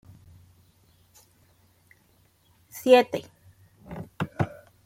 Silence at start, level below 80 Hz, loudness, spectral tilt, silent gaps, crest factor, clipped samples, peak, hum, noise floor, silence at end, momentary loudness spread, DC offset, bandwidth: 2.75 s; -62 dBFS; -24 LUFS; -5.5 dB/octave; none; 26 dB; under 0.1%; -4 dBFS; none; -63 dBFS; 0.4 s; 23 LU; under 0.1%; 16 kHz